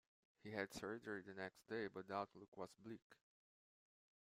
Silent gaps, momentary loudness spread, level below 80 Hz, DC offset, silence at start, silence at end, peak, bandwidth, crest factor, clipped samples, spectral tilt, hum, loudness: 2.48-2.52 s, 3.02-3.10 s; 10 LU; -84 dBFS; under 0.1%; 0.45 s; 1.1 s; -30 dBFS; 15.5 kHz; 22 dB; under 0.1%; -5 dB/octave; none; -51 LUFS